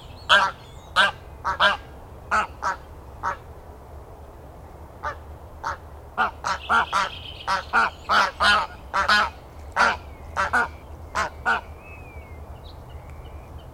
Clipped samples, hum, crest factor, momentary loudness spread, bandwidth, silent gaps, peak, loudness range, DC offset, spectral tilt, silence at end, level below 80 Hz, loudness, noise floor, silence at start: under 0.1%; none; 24 dB; 24 LU; 16.5 kHz; none; -2 dBFS; 11 LU; under 0.1%; -2.5 dB/octave; 0 s; -44 dBFS; -23 LUFS; -42 dBFS; 0 s